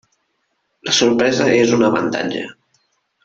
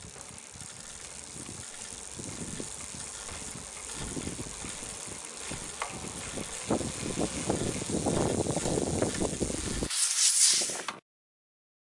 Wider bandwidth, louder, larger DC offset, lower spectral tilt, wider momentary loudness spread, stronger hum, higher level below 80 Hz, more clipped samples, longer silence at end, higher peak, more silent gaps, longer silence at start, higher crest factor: second, 7.8 kHz vs 11.5 kHz; first, -16 LUFS vs -31 LUFS; neither; first, -4 dB/octave vs -2.5 dB/octave; about the same, 14 LU vs 16 LU; neither; second, -56 dBFS vs -50 dBFS; neither; second, 0.75 s vs 0.9 s; first, -2 dBFS vs -8 dBFS; neither; first, 0.85 s vs 0 s; second, 16 dB vs 24 dB